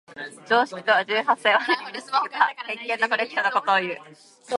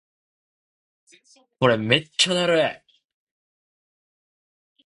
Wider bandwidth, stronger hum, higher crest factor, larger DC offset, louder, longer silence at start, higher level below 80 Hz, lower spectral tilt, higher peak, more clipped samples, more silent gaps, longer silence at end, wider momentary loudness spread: about the same, 11.5 kHz vs 11.5 kHz; neither; about the same, 20 dB vs 24 dB; neither; about the same, -22 LUFS vs -20 LUFS; second, 0.1 s vs 1.6 s; second, -80 dBFS vs -64 dBFS; about the same, -3 dB/octave vs -3.5 dB/octave; about the same, -4 dBFS vs -2 dBFS; neither; neither; second, 0 s vs 2.1 s; first, 11 LU vs 4 LU